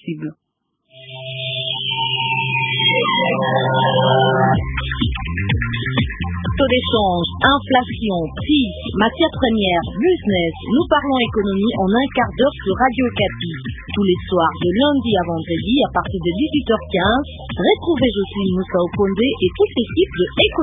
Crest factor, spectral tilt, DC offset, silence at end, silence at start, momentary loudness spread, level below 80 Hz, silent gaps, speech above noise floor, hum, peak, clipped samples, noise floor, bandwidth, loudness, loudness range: 18 dB; -10 dB/octave; under 0.1%; 0 s; 0.05 s; 7 LU; -34 dBFS; none; 49 dB; none; 0 dBFS; under 0.1%; -66 dBFS; 3.9 kHz; -18 LUFS; 2 LU